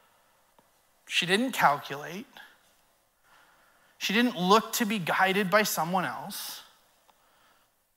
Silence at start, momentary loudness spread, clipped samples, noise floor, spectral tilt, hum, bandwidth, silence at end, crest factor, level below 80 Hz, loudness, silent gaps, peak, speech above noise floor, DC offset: 1.05 s; 15 LU; under 0.1%; -67 dBFS; -3.5 dB/octave; none; 16 kHz; 1.35 s; 22 dB; -80 dBFS; -27 LUFS; none; -8 dBFS; 40 dB; under 0.1%